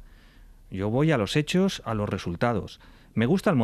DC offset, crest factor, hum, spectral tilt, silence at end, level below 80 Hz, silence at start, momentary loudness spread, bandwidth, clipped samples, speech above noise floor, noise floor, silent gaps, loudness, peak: under 0.1%; 16 dB; none; -6.5 dB/octave; 0 s; -50 dBFS; 0 s; 10 LU; 14 kHz; under 0.1%; 26 dB; -51 dBFS; none; -26 LUFS; -10 dBFS